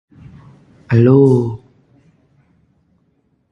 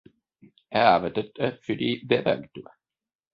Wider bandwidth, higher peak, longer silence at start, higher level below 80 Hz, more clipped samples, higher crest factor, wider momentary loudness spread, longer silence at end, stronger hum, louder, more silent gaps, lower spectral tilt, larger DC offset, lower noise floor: second, 6.2 kHz vs 7 kHz; first, 0 dBFS vs -4 dBFS; first, 0.9 s vs 0.7 s; first, -50 dBFS vs -62 dBFS; neither; about the same, 18 dB vs 22 dB; first, 16 LU vs 11 LU; first, 1.95 s vs 0.7 s; neither; first, -13 LUFS vs -25 LUFS; neither; first, -10.5 dB/octave vs -7.5 dB/octave; neither; about the same, -61 dBFS vs -58 dBFS